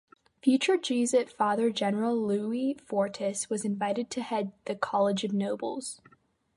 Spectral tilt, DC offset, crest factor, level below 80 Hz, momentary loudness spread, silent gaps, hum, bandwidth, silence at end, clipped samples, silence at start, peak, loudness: -4.5 dB/octave; under 0.1%; 18 dB; -76 dBFS; 8 LU; none; none; 11.5 kHz; 0.6 s; under 0.1%; 0.45 s; -12 dBFS; -29 LUFS